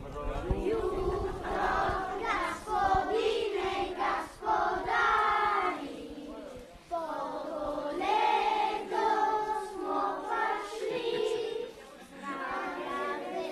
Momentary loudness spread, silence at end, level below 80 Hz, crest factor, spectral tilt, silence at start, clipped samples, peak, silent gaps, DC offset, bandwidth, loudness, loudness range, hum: 12 LU; 0 s; -48 dBFS; 16 dB; -5 dB/octave; 0 s; under 0.1%; -16 dBFS; none; under 0.1%; 13.5 kHz; -31 LUFS; 4 LU; none